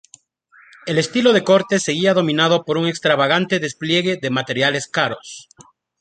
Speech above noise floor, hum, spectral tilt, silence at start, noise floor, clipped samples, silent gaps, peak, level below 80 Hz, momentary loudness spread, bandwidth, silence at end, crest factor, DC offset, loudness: 35 dB; none; -4.5 dB/octave; 0.85 s; -52 dBFS; under 0.1%; none; -2 dBFS; -62 dBFS; 7 LU; 9.4 kHz; 0.6 s; 18 dB; under 0.1%; -17 LUFS